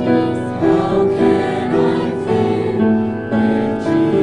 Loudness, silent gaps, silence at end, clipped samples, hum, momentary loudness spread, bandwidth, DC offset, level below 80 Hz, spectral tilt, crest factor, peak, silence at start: -16 LUFS; none; 0 s; under 0.1%; none; 4 LU; 10.5 kHz; under 0.1%; -46 dBFS; -8 dB/octave; 12 dB; -2 dBFS; 0 s